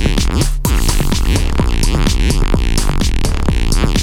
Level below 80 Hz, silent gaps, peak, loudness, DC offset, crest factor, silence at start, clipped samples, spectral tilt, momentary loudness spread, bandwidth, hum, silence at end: -14 dBFS; none; 0 dBFS; -16 LUFS; under 0.1%; 12 dB; 0 s; under 0.1%; -4.5 dB/octave; 2 LU; 16.5 kHz; none; 0 s